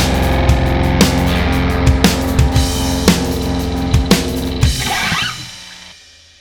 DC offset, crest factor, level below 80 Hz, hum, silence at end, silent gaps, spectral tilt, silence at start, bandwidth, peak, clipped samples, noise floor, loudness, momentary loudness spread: under 0.1%; 14 dB; -20 dBFS; none; 0.5 s; none; -5 dB/octave; 0 s; over 20 kHz; 0 dBFS; under 0.1%; -42 dBFS; -15 LUFS; 7 LU